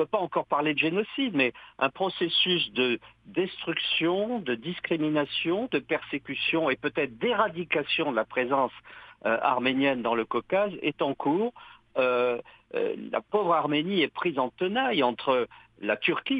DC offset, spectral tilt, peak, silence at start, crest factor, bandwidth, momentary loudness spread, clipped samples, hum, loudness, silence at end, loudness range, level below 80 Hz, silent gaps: under 0.1%; -7.5 dB/octave; -8 dBFS; 0 s; 18 dB; 5 kHz; 7 LU; under 0.1%; none; -27 LUFS; 0 s; 2 LU; -68 dBFS; none